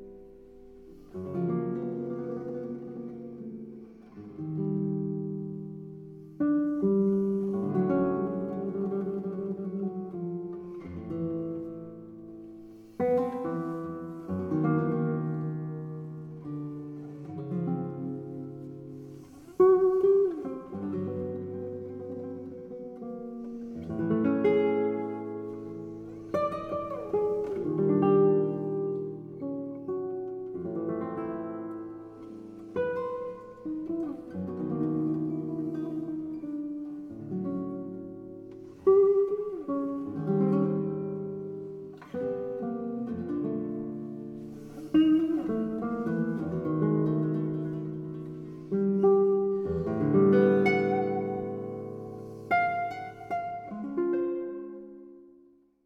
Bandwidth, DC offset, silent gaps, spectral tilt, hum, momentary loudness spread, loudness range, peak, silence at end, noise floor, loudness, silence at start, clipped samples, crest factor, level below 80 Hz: 5.8 kHz; under 0.1%; none; -10 dB/octave; none; 18 LU; 9 LU; -12 dBFS; 0.55 s; -60 dBFS; -30 LUFS; 0 s; under 0.1%; 18 dB; -64 dBFS